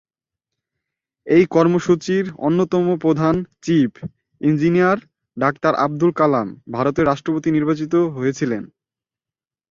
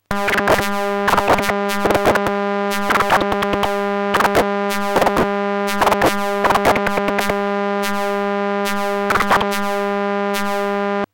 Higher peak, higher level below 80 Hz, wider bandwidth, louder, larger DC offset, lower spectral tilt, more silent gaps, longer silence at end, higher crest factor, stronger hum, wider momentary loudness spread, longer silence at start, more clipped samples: about the same, -2 dBFS vs -2 dBFS; second, -54 dBFS vs -40 dBFS; second, 7.4 kHz vs 17.5 kHz; about the same, -18 LUFS vs -17 LUFS; neither; first, -7.5 dB/octave vs -4.5 dB/octave; neither; first, 1.05 s vs 0.1 s; about the same, 16 dB vs 16 dB; neither; first, 8 LU vs 5 LU; first, 1.25 s vs 0.1 s; neither